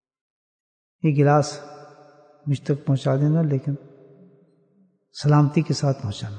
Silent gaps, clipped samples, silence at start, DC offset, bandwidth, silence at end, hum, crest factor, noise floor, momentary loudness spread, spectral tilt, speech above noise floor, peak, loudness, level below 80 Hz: none; under 0.1%; 1.05 s; under 0.1%; 9.2 kHz; 0 s; none; 18 dB; -62 dBFS; 16 LU; -7.5 dB/octave; 41 dB; -6 dBFS; -22 LUFS; -64 dBFS